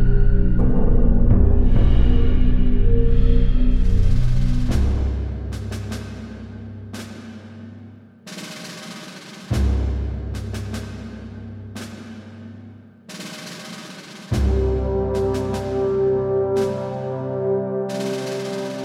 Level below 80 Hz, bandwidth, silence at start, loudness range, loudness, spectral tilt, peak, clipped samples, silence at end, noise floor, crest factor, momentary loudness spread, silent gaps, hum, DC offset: -20 dBFS; 11 kHz; 0 s; 15 LU; -22 LUFS; -7.5 dB/octave; -4 dBFS; under 0.1%; 0 s; -42 dBFS; 16 dB; 18 LU; none; none; under 0.1%